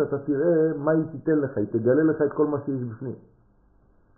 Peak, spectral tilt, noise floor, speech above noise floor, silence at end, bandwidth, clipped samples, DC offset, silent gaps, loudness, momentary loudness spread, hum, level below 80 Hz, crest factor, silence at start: -10 dBFS; -15.5 dB/octave; -59 dBFS; 36 dB; 1 s; 1.9 kHz; under 0.1%; under 0.1%; none; -24 LUFS; 12 LU; none; -62 dBFS; 16 dB; 0 s